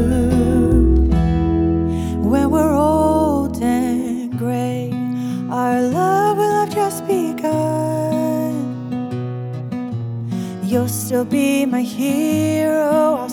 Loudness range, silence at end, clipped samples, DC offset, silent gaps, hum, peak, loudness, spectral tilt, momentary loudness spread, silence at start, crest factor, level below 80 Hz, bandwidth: 6 LU; 0 s; under 0.1%; under 0.1%; none; none; -4 dBFS; -18 LUFS; -7 dB/octave; 10 LU; 0 s; 14 dB; -28 dBFS; 18 kHz